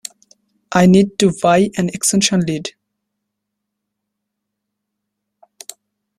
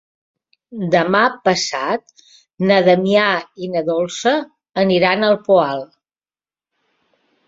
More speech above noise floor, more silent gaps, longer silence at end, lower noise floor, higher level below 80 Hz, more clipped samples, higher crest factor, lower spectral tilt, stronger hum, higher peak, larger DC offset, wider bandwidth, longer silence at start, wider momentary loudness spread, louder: second, 64 dB vs over 74 dB; neither; first, 3.5 s vs 1.65 s; second, -78 dBFS vs under -90 dBFS; first, -52 dBFS vs -62 dBFS; neither; about the same, 18 dB vs 18 dB; about the same, -4.5 dB/octave vs -5 dB/octave; neither; about the same, -2 dBFS vs -2 dBFS; neither; first, 14.5 kHz vs 7.8 kHz; about the same, 0.7 s vs 0.7 s; first, 23 LU vs 10 LU; about the same, -15 LUFS vs -17 LUFS